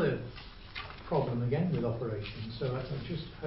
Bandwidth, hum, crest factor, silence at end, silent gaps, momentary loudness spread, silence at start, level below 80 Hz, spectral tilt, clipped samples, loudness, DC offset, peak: 5.8 kHz; none; 16 dB; 0 s; none; 12 LU; 0 s; -52 dBFS; -11 dB/octave; under 0.1%; -35 LUFS; under 0.1%; -18 dBFS